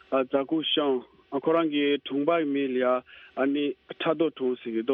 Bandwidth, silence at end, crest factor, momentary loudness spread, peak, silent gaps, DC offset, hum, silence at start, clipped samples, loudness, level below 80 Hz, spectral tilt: 4.1 kHz; 0 s; 16 dB; 6 LU; -10 dBFS; none; under 0.1%; none; 0.1 s; under 0.1%; -27 LUFS; -72 dBFS; -8 dB/octave